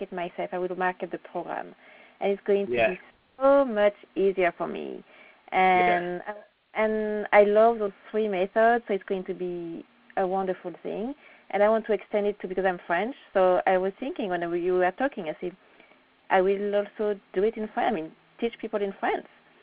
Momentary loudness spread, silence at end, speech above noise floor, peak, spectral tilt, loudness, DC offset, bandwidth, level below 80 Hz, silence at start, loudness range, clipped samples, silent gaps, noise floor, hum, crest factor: 14 LU; 0.4 s; 32 dB; -6 dBFS; -4 dB/octave; -26 LUFS; under 0.1%; 4.9 kHz; -62 dBFS; 0 s; 5 LU; under 0.1%; none; -58 dBFS; none; 20 dB